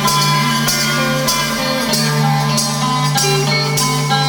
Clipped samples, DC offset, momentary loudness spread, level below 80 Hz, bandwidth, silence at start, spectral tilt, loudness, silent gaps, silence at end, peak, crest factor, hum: under 0.1%; under 0.1%; 2 LU; -44 dBFS; over 20 kHz; 0 s; -3.5 dB/octave; -14 LUFS; none; 0 s; -2 dBFS; 12 dB; none